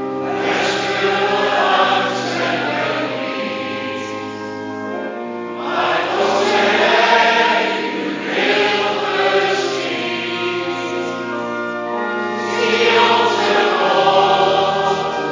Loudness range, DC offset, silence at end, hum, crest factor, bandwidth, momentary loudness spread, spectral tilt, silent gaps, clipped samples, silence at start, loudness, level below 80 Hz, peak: 7 LU; under 0.1%; 0 s; none; 16 dB; 7.6 kHz; 11 LU; -3.5 dB/octave; none; under 0.1%; 0 s; -17 LUFS; -58 dBFS; 0 dBFS